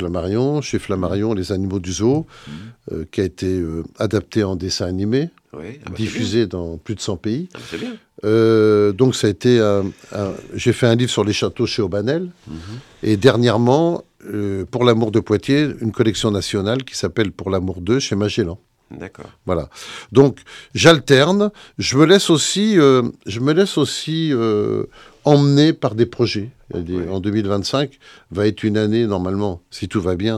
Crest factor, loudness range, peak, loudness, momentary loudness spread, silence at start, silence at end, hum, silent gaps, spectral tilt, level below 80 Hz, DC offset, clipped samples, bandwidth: 18 dB; 7 LU; 0 dBFS; -18 LUFS; 16 LU; 0 s; 0 s; none; none; -5.5 dB/octave; -48 dBFS; under 0.1%; under 0.1%; 13.5 kHz